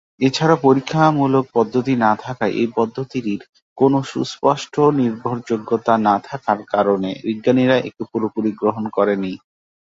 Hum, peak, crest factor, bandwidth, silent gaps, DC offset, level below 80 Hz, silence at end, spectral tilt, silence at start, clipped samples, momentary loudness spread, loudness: none; -2 dBFS; 16 dB; 7.8 kHz; 3.49-3.53 s, 3.62-3.76 s; under 0.1%; -60 dBFS; 0.55 s; -6.5 dB/octave; 0.2 s; under 0.1%; 9 LU; -18 LUFS